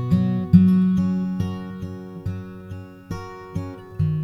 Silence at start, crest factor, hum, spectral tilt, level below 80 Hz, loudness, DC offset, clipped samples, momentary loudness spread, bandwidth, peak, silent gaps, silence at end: 0 s; 20 dB; none; -9.5 dB/octave; -46 dBFS; -21 LUFS; under 0.1%; under 0.1%; 19 LU; 6 kHz; -2 dBFS; none; 0 s